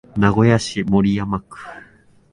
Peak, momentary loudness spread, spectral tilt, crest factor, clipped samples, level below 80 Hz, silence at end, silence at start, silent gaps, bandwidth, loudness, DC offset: 0 dBFS; 21 LU; -6.5 dB/octave; 18 dB; under 0.1%; -42 dBFS; 0.55 s; 0.15 s; none; 11 kHz; -18 LUFS; under 0.1%